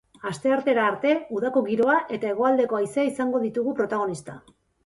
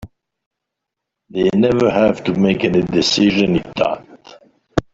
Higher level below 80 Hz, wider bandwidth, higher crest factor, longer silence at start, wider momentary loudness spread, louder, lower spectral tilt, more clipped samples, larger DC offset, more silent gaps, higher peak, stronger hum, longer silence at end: second, -68 dBFS vs -44 dBFS; first, 11.5 kHz vs 7.8 kHz; about the same, 16 dB vs 16 dB; first, 0.25 s vs 0 s; second, 7 LU vs 10 LU; second, -24 LUFS vs -16 LUFS; about the same, -5.5 dB/octave vs -5.5 dB/octave; neither; neither; second, none vs 0.46-0.51 s; second, -8 dBFS vs -2 dBFS; neither; first, 0.45 s vs 0.1 s